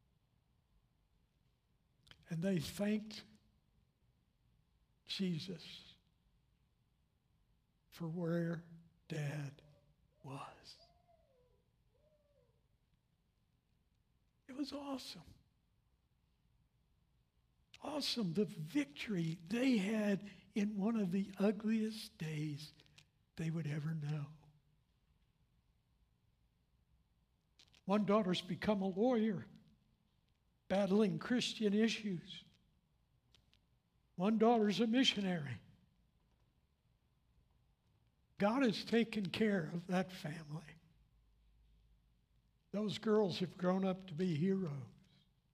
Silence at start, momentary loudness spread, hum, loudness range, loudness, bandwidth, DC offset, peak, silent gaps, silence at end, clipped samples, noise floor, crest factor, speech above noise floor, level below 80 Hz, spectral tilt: 2.3 s; 17 LU; none; 14 LU; -38 LUFS; 15 kHz; under 0.1%; -20 dBFS; none; 0.65 s; under 0.1%; -79 dBFS; 22 dB; 41 dB; -76 dBFS; -6 dB/octave